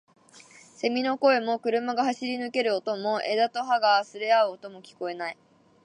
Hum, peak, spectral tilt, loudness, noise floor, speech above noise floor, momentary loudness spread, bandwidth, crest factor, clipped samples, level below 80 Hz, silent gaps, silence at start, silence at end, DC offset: none; -8 dBFS; -3.5 dB/octave; -26 LUFS; -53 dBFS; 27 dB; 13 LU; 10.5 kHz; 18 dB; under 0.1%; -84 dBFS; none; 0.35 s; 0.5 s; under 0.1%